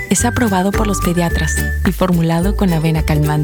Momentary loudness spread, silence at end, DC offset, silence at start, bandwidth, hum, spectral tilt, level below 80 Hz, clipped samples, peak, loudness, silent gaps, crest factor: 2 LU; 0 s; under 0.1%; 0 s; over 20 kHz; none; -5.5 dB/octave; -22 dBFS; under 0.1%; -2 dBFS; -15 LUFS; none; 12 dB